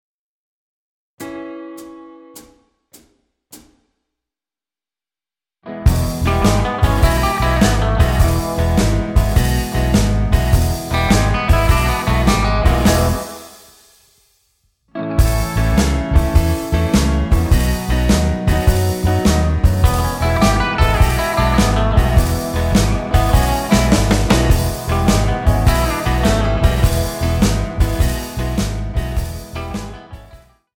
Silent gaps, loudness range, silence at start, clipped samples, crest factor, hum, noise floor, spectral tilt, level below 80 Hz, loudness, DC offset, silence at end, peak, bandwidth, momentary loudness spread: none; 6 LU; 1.2 s; under 0.1%; 16 dB; none; under -90 dBFS; -5.5 dB/octave; -20 dBFS; -16 LUFS; under 0.1%; 0.4 s; 0 dBFS; 17.5 kHz; 9 LU